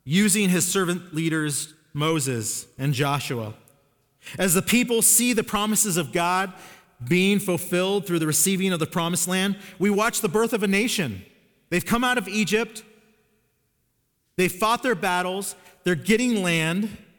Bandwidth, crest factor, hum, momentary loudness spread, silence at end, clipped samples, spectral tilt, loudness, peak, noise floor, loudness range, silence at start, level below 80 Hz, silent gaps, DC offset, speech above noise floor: 19.5 kHz; 18 dB; none; 10 LU; 0.2 s; under 0.1%; -3.5 dB/octave; -22 LUFS; -6 dBFS; -71 dBFS; 5 LU; 0.05 s; -56 dBFS; none; under 0.1%; 48 dB